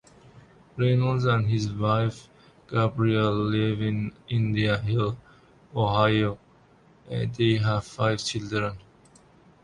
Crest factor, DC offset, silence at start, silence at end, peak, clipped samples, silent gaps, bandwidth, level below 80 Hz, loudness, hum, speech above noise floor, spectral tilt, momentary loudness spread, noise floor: 20 dB; under 0.1%; 0.35 s; 0.85 s; -6 dBFS; under 0.1%; none; 10.5 kHz; -52 dBFS; -26 LUFS; none; 32 dB; -6.5 dB/octave; 10 LU; -57 dBFS